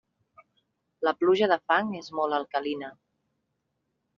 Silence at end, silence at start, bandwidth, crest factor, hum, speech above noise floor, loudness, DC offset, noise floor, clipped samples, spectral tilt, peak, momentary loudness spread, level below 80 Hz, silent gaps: 1.25 s; 1 s; 7 kHz; 22 dB; none; 53 dB; -27 LUFS; under 0.1%; -79 dBFS; under 0.1%; -2.5 dB/octave; -8 dBFS; 11 LU; -74 dBFS; none